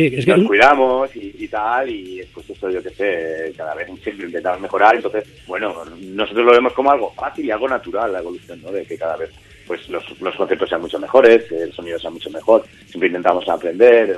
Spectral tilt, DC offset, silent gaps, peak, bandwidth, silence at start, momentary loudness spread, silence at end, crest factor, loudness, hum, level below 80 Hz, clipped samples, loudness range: -6 dB/octave; under 0.1%; none; 0 dBFS; 11.5 kHz; 0 s; 17 LU; 0 s; 18 dB; -17 LUFS; none; -52 dBFS; under 0.1%; 7 LU